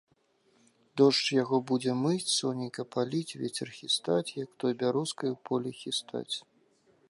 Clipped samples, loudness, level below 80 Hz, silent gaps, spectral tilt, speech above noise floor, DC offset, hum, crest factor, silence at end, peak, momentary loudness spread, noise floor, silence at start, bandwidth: under 0.1%; -30 LUFS; -80 dBFS; none; -4.5 dB/octave; 39 dB; under 0.1%; none; 20 dB; 0.7 s; -10 dBFS; 10 LU; -69 dBFS; 0.95 s; 11.5 kHz